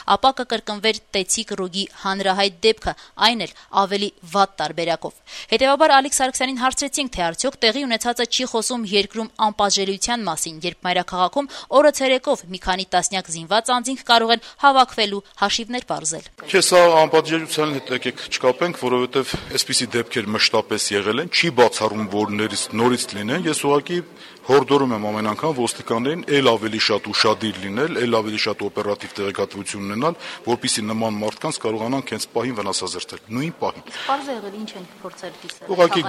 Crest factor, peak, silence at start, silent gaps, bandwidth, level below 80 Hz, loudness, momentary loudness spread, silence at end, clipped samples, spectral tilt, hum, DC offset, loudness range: 20 dB; 0 dBFS; 0 s; none; 15 kHz; -52 dBFS; -20 LUFS; 10 LU; 0 s; under 0.1%; -3 dB/octave; none; under 0.1%; 6 LU